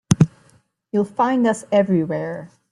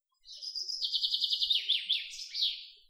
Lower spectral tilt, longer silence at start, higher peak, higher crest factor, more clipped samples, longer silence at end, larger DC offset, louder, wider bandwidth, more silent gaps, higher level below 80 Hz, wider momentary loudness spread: first, -7 dB/octave vs 5 dB/octave; second, 0.1 s vs 0.25 s; first, 0 dBFS vs -16 dBFS; about the same, 20 dB vs 18 dB; neither; about the same, 0.25 s vs 0.15 s; neither; first, -20 LUFS vs -30 LUFS; second, 12 kHz vs 16.5 kHz; neither; first, -52 dBFS vs -74 dBFS; about the same, 9 LU vs 11 LU